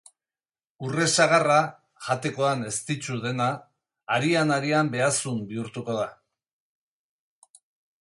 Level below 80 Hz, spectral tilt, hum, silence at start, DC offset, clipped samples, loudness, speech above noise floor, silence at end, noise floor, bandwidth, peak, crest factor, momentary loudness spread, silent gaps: -68 dBFS; -4 dB/octave; none; 0.8 s; under 0.1%; under 0.1%; -25 LUFS; over 66 dB; 1.85 s; under -90 dBFS; 11.5 kHz; -6 dBFS; 22 dB; 13 LU; none